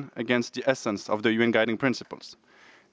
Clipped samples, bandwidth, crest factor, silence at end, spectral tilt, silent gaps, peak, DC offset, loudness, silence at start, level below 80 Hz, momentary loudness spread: under 0.1%; 8 kHz; 22 dB; 0.6 s; -5 dB/octave; none; -6 dBFS; under 0.1%; -26 LUFS; 0 s; -72 dBFS; 18 LU